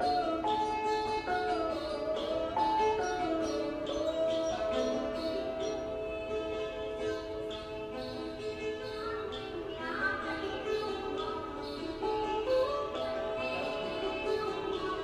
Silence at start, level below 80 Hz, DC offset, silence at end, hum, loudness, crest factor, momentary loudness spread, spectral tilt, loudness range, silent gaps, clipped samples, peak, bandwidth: 0 s; -54 dBFS; under 0.1%; 0 s; none; -34 LUFS; 14 dB; 8 LU; -4.5 dB/octave; 5 LU; none; under 0.1%; -20 dBFS; 14 kHz